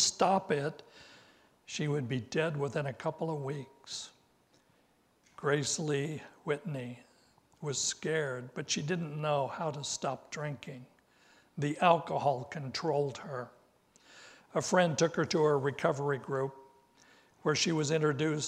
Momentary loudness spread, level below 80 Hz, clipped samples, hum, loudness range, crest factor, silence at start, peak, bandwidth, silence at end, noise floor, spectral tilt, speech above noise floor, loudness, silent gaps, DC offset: 14 LU; -74 dBFS; under 0.1%; none; 5 LU; 22 dB; 0 s; -12 dBFS; 13 kHz; 0 s; -69 dBFS; -4 dB/octave; 37 dB; -33 LUFS; none; under 0.1%